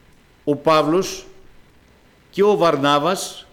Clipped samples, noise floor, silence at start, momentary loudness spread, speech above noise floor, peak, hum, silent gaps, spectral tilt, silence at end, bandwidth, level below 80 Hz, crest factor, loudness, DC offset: under 0.1%; -52 dBFS; 0.45 s; 13 LU; 35 dB; -6 dBFS; none; none; -4.5 dB/octave; 0.1 s; 17 kHz; -52 dBFS; 14 dB; -18 LUFS; under 0.1%